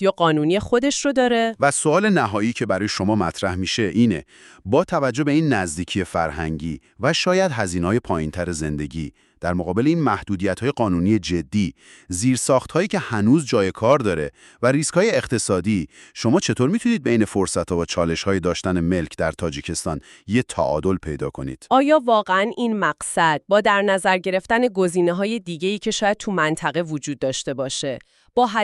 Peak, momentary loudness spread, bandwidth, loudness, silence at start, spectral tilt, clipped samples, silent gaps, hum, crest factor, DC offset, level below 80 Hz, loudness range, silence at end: -4 dBFS; 8 LU; 12.5 kHz; -21 LUFS; 0 s; -5 dB/octave; under 0.1%; none; none; 18 dB; under 0.1%; -46 dBFS; 4 LU; 0 s